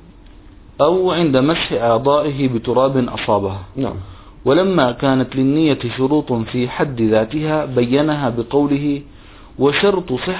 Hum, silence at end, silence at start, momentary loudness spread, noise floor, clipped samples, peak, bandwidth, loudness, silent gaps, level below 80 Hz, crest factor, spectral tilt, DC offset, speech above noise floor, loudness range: none; 0 s; 0.1 s; 7 LU; -41 dBFS; under 0.1%; 0 dBFS; 4 kHz; -17 LUFS; none; -42 dBFS; 16 dB; -11 dB/octave; under 0.1%; 25 dB; 2 LU